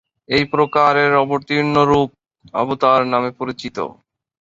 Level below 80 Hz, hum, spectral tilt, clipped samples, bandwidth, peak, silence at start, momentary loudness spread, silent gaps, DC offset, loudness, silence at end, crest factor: -50 dBFS; none; -6.5 dB/octave; under 0.1%; 7.6 kHz; 0 dBFS; 0.3 s; 12 LU; none; under 0.1%; -17 LUFS; 0.5 s; 16 dB